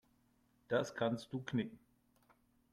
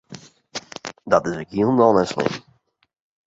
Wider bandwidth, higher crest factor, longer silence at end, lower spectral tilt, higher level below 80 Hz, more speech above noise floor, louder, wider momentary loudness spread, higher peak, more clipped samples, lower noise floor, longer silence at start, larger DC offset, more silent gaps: first, 14 kHz vs 8 kHz; about the same, 20 dB vs 20 dB; about the same, 0.95 s vs 0.85 s; about the same, -6 dB/octave vs -6 dB/octave; second, -76 dBFS vs -56 dBFS; first, 36 dB vs 25 dB; second, -40 LUFS vs -20 LUFS; second, 5 LU vs 19 LU; second, -24 dBFS vs -2 dBFS; neither; first, -74 dBFS vs -43 dBFS; first, 0.7 s vs 0.1 s; neither; neither